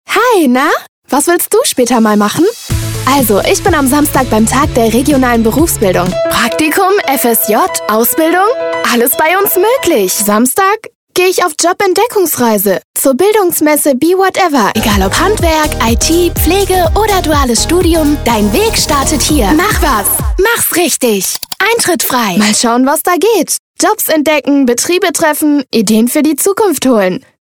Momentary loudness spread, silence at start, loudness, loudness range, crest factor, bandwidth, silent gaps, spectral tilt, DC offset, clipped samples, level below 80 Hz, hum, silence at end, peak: 3 LU; 0.1 s; -10 LUFS; 1 LU; 10 dB; over 20 kHz; 0.89-1.02 s, 10.95-11.07 s, 12.84-12.94 s, 23.59-23.74 s; -3.5 dB/octave; under 0.1%; under 0.1%; -24 dBFS; none; 0.2 s; 0 dBFS